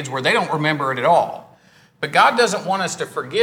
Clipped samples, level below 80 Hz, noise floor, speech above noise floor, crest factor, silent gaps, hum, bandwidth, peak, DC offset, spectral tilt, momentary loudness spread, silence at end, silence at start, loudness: under 0.1%; -70 dBFS; -52 dBFS; 33 dB; 18 dB; none; none; over 20 kHz; 0 dBFS; under 0.1%; -3.5 dB/octave; 12 LU; 0 s; 0 s; -18 LUFS